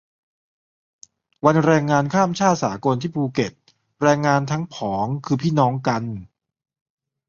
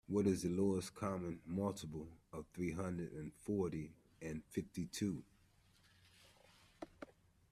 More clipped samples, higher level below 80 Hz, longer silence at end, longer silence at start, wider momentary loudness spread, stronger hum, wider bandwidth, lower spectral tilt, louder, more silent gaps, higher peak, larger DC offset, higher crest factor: neither; first, -56 dBFS vs -68 dBFS; first, 1.05 s vs 0.45 s; first, 1.45 s vs 0.1 s; second, 9 LU vs 17 LU; neither; second, 7.4 kHz vs 14 kHz; about the same, -6.5 dB/octave vs -6.5 dB/octave; first, -20 LUFS vs -43 LUFS; neither; first, -2 dBFS vs -24 dBFS; neither; about the same, 20 dB vs 20 dB